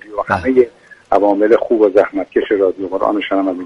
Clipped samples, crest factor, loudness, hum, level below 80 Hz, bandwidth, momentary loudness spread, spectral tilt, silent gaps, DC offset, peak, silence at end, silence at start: under 0.1%; 14 dB; -15 LUFS; none; -50 dBFS; 7.2 kHz; 6 LU; -7 dB/octave; none; under 0.1%; 0 dBFS; 0 s; 0.05 s